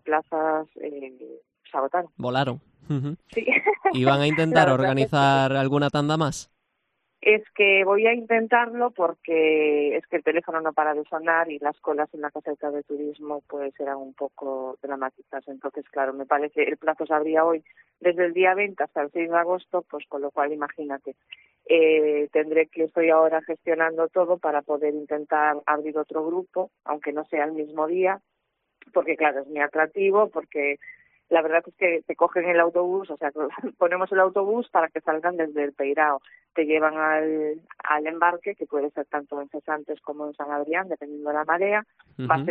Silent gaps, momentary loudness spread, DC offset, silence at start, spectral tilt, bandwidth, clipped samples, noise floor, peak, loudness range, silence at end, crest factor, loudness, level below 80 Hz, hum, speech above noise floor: none; 12 LU; under 0.1%; 0.05 s; -6.5 dB/octave; 9.4 kHz; under 0.1%; -76 dBFS; -4 dBFS; 7 LU; 0 s; 20 dB; -24 LUFS; -68 dBFS; none; 52 dB